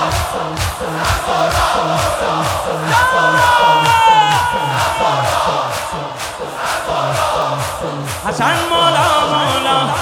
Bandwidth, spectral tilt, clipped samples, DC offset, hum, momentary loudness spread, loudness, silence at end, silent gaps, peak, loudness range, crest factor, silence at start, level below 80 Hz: 17.5 kHz; -3.5 dB/octave; under 0.1%; under 0.1%; none; 11 LU; -14 LUFS; 0 s; none; 0 dBFS; 5 LU; 14 dB; 0 s; -36 dBFS